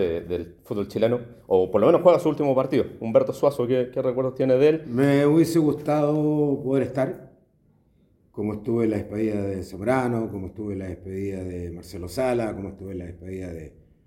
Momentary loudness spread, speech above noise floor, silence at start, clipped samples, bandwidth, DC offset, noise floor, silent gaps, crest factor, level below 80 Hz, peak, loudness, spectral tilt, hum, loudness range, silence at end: 16 LU; 39 dB; 0 s; under 0.1%; 17 kHz; under 0.1%; -62 dBFS; none; 20 dB; -56 dBFS; -2 dBFS; -23 LUFS; -7.5 dB/octave; none; 7 LU; 0.35 s